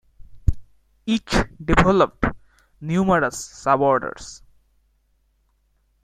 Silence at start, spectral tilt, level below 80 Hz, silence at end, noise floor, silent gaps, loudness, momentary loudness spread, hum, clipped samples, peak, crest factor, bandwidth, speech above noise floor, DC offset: 0.3 s; -5.5 dB/octave; -34 dBFS; 1.65 s; -65 dBFS; none; -21 LUFS; 16 LU; none; under 0.1%; 0 dBFS; 22 dB; 14 kHz; 45 dB; under 0.1%